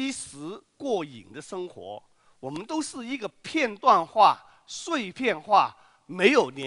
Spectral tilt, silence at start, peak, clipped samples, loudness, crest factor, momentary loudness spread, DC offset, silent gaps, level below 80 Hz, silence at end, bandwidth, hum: -3.5 dB/octave; 0 s; -4 dBFS; under 0.1%; -25 LUFS; 22 dB; 20 LU; under 0.1%; none; -70 dBFS; 0 s; 11 kHz; none